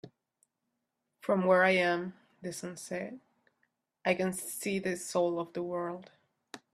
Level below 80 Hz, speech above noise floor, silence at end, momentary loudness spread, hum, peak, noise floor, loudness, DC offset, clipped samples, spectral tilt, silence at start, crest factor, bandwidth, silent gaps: -76 dBFS; 53 dB; 0.15 s; 19 LU; none; -12 dBFS; -84 dBFS; -32 LUFS; under 0.1%; under 0.1%; -4.5 dB/octave; 0.05 s; 22 dB; 14 kHz; none